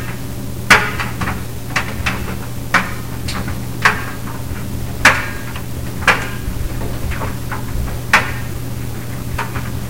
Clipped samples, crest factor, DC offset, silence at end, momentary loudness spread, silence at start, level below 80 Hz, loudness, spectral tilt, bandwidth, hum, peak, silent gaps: under 0.1%; 20 dB; 4%; 0 s; 14 LU; 0 s; -30 dBFS; -18 LUFS; -4 dB/octave; 17 kHz; none; 0 dBFS; none